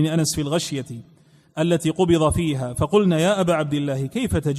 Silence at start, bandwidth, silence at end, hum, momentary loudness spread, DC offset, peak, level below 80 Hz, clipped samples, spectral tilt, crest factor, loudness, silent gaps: 0 s; 14.5 kHz; 0 s; none; 10 LU; under 0.1%; -6 dBFS; -42 dBFS; under 0.1%; -5.5 dB/octave; 16 dB; -21 LUFS; none